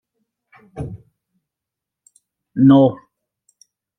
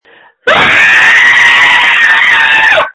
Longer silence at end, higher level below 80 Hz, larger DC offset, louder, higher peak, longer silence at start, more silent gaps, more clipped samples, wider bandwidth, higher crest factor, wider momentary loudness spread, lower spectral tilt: first, 1.05 s vs 0.05 s; second, -54 dBFS vs -44 dBFS; neither; second, -13 LUFS vs -4 LUFS; about the same, -2 dBFS vs 0 dBFS; first, 0.75 s vs 0.45 s; neither; second, under 0.1% vs 3%; second, 6 kHz vs 11 kHz; first, 20 dB vs 6 dB; first, 21 LU vs 4 LU; first, -9.5 dB/octave vs -1 dB/octave